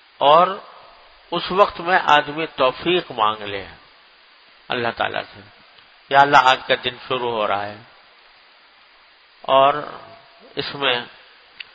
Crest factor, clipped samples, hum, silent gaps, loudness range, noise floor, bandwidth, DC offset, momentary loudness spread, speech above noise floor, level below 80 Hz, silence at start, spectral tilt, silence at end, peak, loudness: 20 dB; under 0.1%; none; none; 5 LU; -52 dBFS; 8 kHz; under 0.1%; 19 LU; 33 dB; -58 dBFS; 0.2 s; -4.5 dB/octave; 0.65 s; 0 dBFS; -18 LUFS